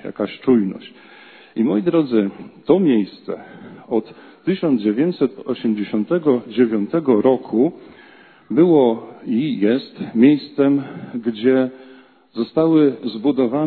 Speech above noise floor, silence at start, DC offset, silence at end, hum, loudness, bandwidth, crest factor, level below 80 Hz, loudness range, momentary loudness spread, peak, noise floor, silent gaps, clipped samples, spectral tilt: 29 dB; 0.05 s; under 0.1%; 0 s; none; -18 LUFS; 4.5 kHz; 18 dB; -64 dBFS; 3 LU; 12 LU; 0 dBFS; -47 dBFS; none; under 0.1%; -11 dB/octave